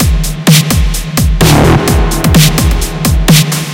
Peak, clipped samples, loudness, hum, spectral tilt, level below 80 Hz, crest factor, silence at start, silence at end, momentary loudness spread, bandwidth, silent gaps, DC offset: 0 dBFS; 2%; -9 LUFS; none; -4.5 dB/octave; -14 dBFS; 8 dB; 0 s; 0 s; 6 LU; over 20 kHz; none; under 0.1%